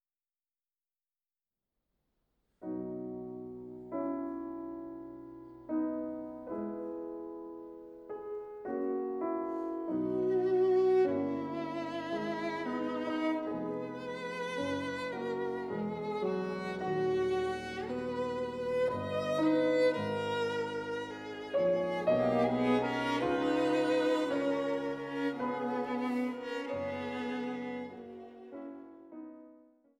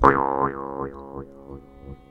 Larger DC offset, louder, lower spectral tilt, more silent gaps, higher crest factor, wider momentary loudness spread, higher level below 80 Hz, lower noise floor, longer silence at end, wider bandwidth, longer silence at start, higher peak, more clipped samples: neither; second, -34 LUFS vs -24 LUFS; second, -6.5 dB/octave vs -8.5 dB/octave; neither; second, 16 dB vs 24 dB; second, 16 LU vs 22 LU; second, -68 dBFS vs -42 dBFS; first, under -90 dBFS vs -43 dBFS; first, 0.4 s vs 0.15 s; about the same, 11.5 kHz vs 10.5 kHz; first, 2.6 s vs 0 s; second, -18 dBFS vs 0 dBFS; neither